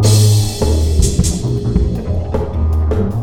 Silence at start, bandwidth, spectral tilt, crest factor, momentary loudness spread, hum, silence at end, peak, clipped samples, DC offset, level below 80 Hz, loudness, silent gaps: 0 s; 16.5 kHz; -6 dB/octave; 14 dB; 7 LU; none; 0 s; 0 dBFS; under 0.1%; under 0.1%; -18 dBFS; -15 LUFS; none